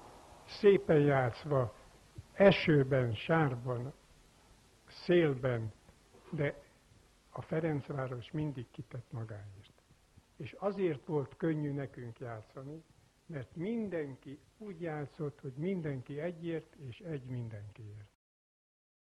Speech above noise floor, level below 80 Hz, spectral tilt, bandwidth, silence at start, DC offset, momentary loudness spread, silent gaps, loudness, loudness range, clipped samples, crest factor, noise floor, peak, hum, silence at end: 31 dB; -64 dBFS; -8 dB/octave; 11.5 kHz; 0 s; under 0.1%; 22 LU; none; -34 LUFS; 11 LU; under 0.1%; 24 dB; -65 dBFS; -12 dBFS; none; 1 s